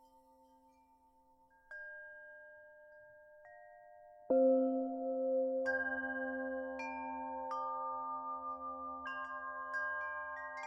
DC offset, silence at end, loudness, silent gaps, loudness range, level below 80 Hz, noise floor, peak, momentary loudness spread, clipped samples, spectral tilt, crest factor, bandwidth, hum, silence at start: under 0.1%; 0 s; -38 LUFS; none; 19 LU; -76 dBFS; -69 dBFS; -22 dBFS; 24 LU; under 0.1%; -5.5 dB/octave; 18 dB; 7 kHz; none; 1.7 s